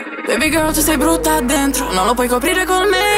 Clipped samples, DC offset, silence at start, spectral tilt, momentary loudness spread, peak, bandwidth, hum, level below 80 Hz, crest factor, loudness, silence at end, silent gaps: under 0.1%; under 0.1%; 0 s; -3 dB/octave; 2 LU; -2 dBFS; 16.5 kHz; none; -30 dBFS; 14 dB; -15 LUFS; 0 s; none